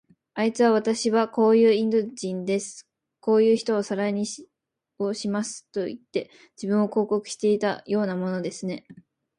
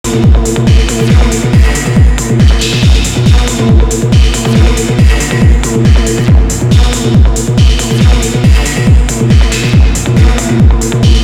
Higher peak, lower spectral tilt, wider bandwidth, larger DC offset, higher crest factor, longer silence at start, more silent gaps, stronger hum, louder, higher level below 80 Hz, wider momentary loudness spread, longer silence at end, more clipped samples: second, -10 dBFS vs 0 dBFS; about the same, -5.5 dB/octave vs -5.5 dB/octave; second, 11 kHz vs 15.5 kHz; neither; first, 16 dB vs 6 dB; first, 0.35 s vs 0.05 s; neither; neither; second, -24 LUFS vs -9 LUFS; second, -72 dBFS vs -10 dBFS; first, 13 LU vs 1 LU; first, 0.45 s vs 0 s; second, under 0.1% vs 0.9%